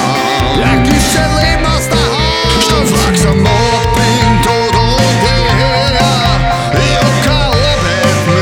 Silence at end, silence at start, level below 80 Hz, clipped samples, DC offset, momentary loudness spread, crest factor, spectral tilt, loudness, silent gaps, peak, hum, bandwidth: 0 s; 0 s; -20 dBFS; under 0.1%; under 0.1%; 2 LU; 10 dB; -4.5 dB/octave; -10 LUFS; none; 0 dBFS; none; 17.5 kHz